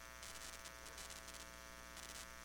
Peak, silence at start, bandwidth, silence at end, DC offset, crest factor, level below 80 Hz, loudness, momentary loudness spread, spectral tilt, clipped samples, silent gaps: -34 dBFS; 0 s; 19 kHz; 0 s; under 0.1%; 20 dB; -64 dBFS; -52 LUFS; 3 LU; -1.5 dB/octave; under 0.1%; none